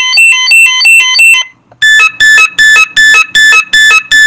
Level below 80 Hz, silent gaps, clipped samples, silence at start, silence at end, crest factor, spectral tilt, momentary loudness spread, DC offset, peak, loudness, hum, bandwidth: -42 dBFS; none; 5%; 0 s; 0 s; 4 dB; 3 dB/octave; 2 LU; under 0.1%; 0 dBFS; -2 LUFS; none; over 20 kHz